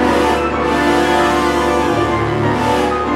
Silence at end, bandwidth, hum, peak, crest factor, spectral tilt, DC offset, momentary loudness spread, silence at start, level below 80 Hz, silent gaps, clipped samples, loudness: 0 s; 15.5 kHz; none; -2 dBFS; 12 dB; -5.5 dB/octave; under 0.1%; 3 LU; 0 s; -32 dBFS; none; under 0.1%; -14 LUFS